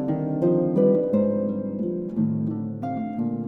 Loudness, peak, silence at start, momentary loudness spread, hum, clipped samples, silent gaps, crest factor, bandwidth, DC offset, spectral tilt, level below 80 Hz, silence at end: -24 LUFS; -8 dBFS; 0 s; 9 LU; none; under 0.1%; none; 14 dB; 3.7 kHz; under 0.1%; -12 dB/octave; -60 dBFS; 0 s